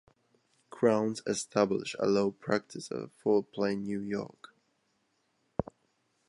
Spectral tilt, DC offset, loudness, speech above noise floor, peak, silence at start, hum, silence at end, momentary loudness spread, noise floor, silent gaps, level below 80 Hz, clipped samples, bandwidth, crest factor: -5.5 dB/octave; under 0.1%; -32 LUFS; 45 dB; -10 dBFS; 0.75 s; none; 0.65 s; 11 LU; -75 dBFS; none; -64 dBFS; under 0.1%; 11.5 kHz; 22 dB